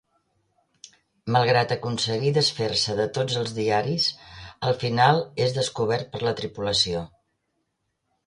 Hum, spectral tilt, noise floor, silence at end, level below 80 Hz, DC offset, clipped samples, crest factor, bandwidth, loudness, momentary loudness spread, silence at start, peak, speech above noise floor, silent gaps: none; -4.5 dB/octave; -76 dBFS; 1.2 s; -56 dBFS; under 0.1%; under 0.1%; 20 dB; 11.5 kHz; -24 LUFS; 9 LU; 1.25 s; -4 dBFS; 53 dB; none